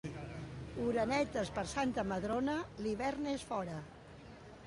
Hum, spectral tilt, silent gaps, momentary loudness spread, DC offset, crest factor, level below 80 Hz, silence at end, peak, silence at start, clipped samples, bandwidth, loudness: none; -5.5 dB/octave; none; 18 LU; under 0.1%; 16 dB; -58 dBFS; 0 s; -22 dBFS; 0.05 s; under 0.1%; 11.5 kHz; -38 LUFS